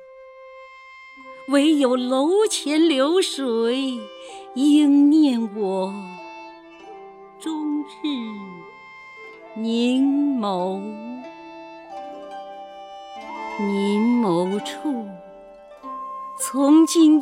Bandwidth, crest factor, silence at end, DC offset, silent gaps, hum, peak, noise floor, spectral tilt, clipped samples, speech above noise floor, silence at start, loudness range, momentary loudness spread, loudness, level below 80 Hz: 15.5 kHz; 16 dB; 0 s; under 0.1%; none; none; -6 dBFS; -44 dBFS; -4.5 dB/octave; under 0.1%; 24 dB; 0 s; 11 LU; 25 LU; -20 LUFS; -70 dBFS